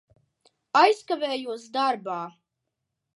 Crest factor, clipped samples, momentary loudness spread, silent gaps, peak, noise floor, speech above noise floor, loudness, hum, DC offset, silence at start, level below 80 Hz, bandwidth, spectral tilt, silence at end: 22 dB; under 0.1%; 14 LU; none; -4 dBFS; -82 dBFS; 58 dB; -25 LUFS; none; under 0.1%; 0.75 s; -82 dBFS; 11.5 kHz; -3.5 dB/octave; 0.85 s